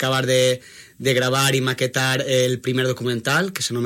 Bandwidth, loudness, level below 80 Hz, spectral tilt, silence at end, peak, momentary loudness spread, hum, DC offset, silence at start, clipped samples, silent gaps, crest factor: 16.5 kHz; -20 LUFS; -62 dBFS; -4 dB/octave; 0 s; -4 dBFS; 5 LU; none; under 0.1%; 0 s; under 0.1%; none; 16 dB